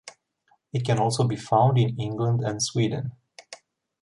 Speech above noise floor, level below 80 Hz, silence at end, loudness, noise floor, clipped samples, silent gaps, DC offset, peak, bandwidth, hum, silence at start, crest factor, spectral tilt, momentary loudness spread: 44 dB; -60 dBFS; 0.5 s; -24 LUFS; -67 dBFS; under 0.1%; none; under 0.1%; -6 dBFS; 11.5 kHz; none; 0.05 s; 18 dB; -6 dB/octave; 23 LU